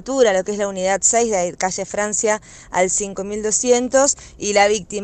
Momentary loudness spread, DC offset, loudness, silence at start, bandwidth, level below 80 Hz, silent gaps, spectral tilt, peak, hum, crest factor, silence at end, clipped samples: 8 LU; under 0.1%; -18 LUFS; 0 s; 9.6 kHz; -48 dBFS; none; -2 dB/octave; -2 dBFS; none; 16 dB; 0 s; under 0.1%